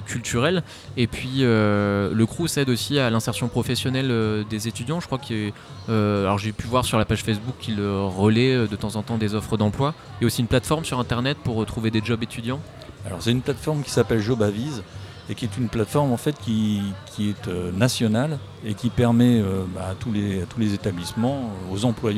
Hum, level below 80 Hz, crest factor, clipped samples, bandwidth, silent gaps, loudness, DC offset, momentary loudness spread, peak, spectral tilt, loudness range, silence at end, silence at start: none; -46 dBFS; 18 dB; under 0.1%; 15.5 kHz; none; -23 LUFS; under 0.1%; 9 LU; -6 dBFS; -6 dB/octave; 3 LU; 0 s; 0 s